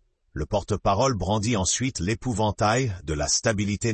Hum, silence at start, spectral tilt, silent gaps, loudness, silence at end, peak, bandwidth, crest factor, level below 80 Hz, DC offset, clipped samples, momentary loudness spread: none; 0.35 s; -4 dB/octave; none; -24 LUFS; 0 s; -8 dBFS; 8.8 kHz; 16 dB; -42 dBFS; under 0.1%; under 0.1%; 6 LU